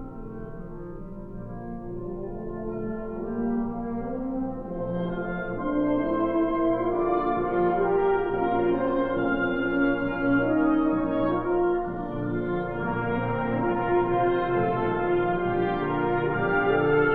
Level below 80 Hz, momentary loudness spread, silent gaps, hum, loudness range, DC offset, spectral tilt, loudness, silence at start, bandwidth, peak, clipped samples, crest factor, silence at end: -42 dBFS; 13 LU; none; 60 Hz at -50 dBFS; 8 LU; under 0.1%; -10 dB/octave; -26 LUFS; 0 s; 4.4 kHz; -12 dBFS; under 0.1%; 14 dB; 0 s